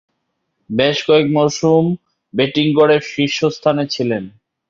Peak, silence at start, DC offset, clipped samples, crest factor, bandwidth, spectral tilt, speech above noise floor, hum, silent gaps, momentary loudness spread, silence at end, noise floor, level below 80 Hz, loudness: 0 dBFS; 0.7 s; under 0.1%; under 0.1%; 16 dB; 7.6 kHz; -5.5 dB/octave; 56 dB; none; none; 11 LU; 0.4 s; -71 dBFS; -56 dBFS; -16 LUFS